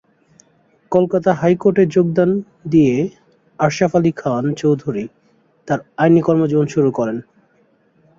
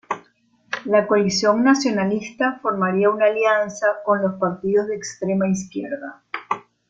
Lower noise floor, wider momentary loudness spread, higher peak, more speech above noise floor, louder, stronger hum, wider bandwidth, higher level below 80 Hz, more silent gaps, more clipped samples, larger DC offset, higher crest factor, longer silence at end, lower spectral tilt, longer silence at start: about the same, -58 dBFS vs -58 dBFS; second, 9 LU vs 13 LU; about the same, -2 dBFS vs -4 dBFS; about the same, 42 dB vs 39 dB; first, -17 LUFS vs -20 LUFS; neither; about the same, 7.6 kHz vs 7.8 kHz; first, -54 dBFS vs -62 dBFS; neither; neither; neither; about the same, 16 dB vs 18 dB; first, 1 s vs 0.3 s; first, -7.5 dB/octave vs -5 dB/octave; first, 0.9 s vs 0.1 s